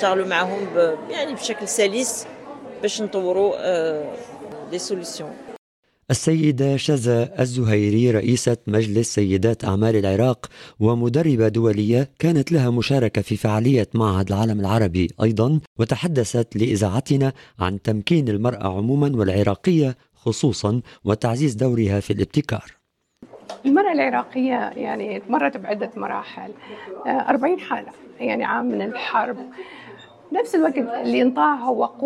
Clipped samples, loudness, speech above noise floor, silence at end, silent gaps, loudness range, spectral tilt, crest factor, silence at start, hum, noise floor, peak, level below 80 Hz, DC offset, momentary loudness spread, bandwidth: under 0.1%; -21 LUFS; 30 dB; 0 s; 5.58-5.83 s, 15.67-15.76 s; 5 LU; -6 dB/octave; 18 dB; 0 s; none; -50 dBFS; -4 dBFS; -52 dBFS; under 0.1%; 11 LU; 13 kHz